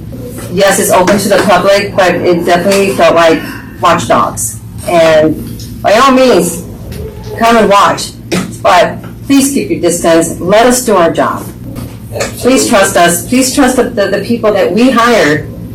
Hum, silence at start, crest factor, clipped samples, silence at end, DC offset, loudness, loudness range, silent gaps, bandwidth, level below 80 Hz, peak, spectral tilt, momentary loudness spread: none; 0 s; 8 dB; 0.5%; 0 s; under 0.1%; -8 LUFS; 2 LU; none; 19 kHz; -34 dBFS; 0 dBFS; -4 dB/octave; 15 LU